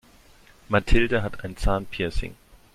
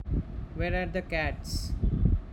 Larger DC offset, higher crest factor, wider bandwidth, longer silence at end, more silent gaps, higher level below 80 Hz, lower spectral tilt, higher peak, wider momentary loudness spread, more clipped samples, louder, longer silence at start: neither; about the same, 20 dB vs 18 dB; second, 12.5 kHz vs 16.5 kHz; first, 0.4 s vs 0 s; neither; about the same, -30 dBFS vs -32 dBFS; about the same, -6 dB/octave vs -6.5 dB/octave; first, -4 dBFS vs -12 dBFS; first, 11 LU vs 6 LU; neither; first, -26 LUFS vs -31 LUFS; first, 0.7 s vs 0 s